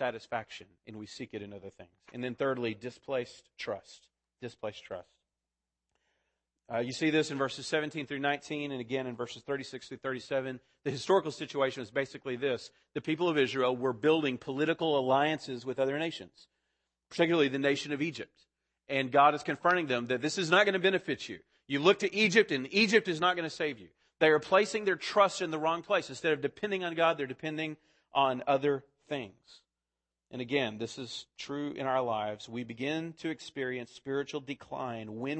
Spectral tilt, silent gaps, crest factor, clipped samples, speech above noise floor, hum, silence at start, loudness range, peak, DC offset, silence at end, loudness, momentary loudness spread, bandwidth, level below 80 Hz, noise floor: -4.5 dB/octave; none; 22 dB; under 0.1%; 58 dB; none; 0 s; 10 LU; -10 dBFS; under 0.1%; 0 s; -31 LUFS; 16 LU; 8.8 kHz; -76 dBFS; -90 dBFS